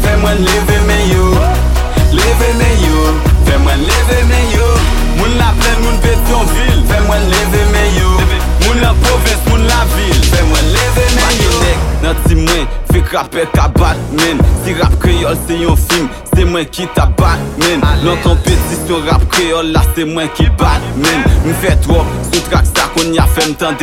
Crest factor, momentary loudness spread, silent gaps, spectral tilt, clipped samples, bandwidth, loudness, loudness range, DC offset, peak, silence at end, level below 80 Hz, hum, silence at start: 10 dB; 3 LU; none; -5 dB/octave; under 0.1%; 17 kHz; -11 LUFS; 2 LU; under 0.1%; 0 dBFS; 0 s; -12 dBFS; none; 0 s